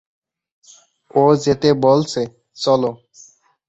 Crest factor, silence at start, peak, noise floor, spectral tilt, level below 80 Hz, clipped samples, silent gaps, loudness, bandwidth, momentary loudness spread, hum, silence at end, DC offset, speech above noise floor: 16 dB; 1.15 s; -2 dBFS; -50 dBFS; -6 dB/octave; -56 dBFS; under 0.1%; none; -17 LUFS; 8.2 kHz; 10 LU; none; 0.75 s; under 0.1%; 34 dB